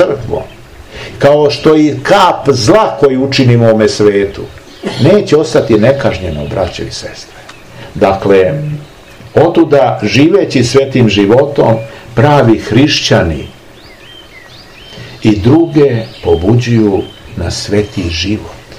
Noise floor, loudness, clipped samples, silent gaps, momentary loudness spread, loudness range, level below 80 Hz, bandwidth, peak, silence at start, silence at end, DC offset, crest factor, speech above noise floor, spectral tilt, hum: -35 dBFS; -9 LUFS; 3%; none; 15 LU; 4 LU; -34 dBFS; 12.5 kHz; 0 dBFS; 0 s; 0 s; 0.5%; 10 dB; 26 dB; -6 dB/octave; none